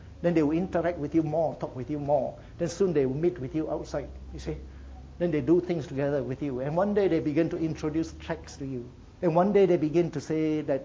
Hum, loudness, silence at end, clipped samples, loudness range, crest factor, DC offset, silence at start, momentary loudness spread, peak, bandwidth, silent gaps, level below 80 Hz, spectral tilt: none; -28 LUFS; 0 s; under 0.1%; 3 LU; 18 dB; under 0.1%; 0 s; 13 LU; -10 dBFS; 7.8 kHz; none; -48 dBFS; -7.5 dB/octave